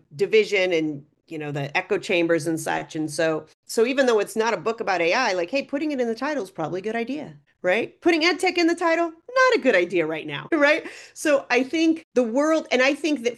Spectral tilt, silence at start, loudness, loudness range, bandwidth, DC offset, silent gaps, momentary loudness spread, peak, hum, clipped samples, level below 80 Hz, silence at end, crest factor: -4 dB/octave; 0.15 s; -22 LUFS; 4 LU; 12.5 kHz; under 0.1%; 3.54-3.63 s, 12.04-12.12 s; 10 LU; -6 dBFS; none; under 0.1%; -72 dBFS; 0 s; 16 dB